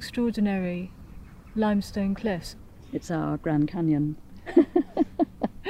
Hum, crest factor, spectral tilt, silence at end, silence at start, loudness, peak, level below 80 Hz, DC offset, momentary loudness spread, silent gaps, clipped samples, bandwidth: none; 20 dB; -7.5 dB/octave; 0 s; 0 s; -27 LUFS; -6 dBFS; -48 dBFS; under 0.1%; 16 LU; none; under 0.1%; 15 kHz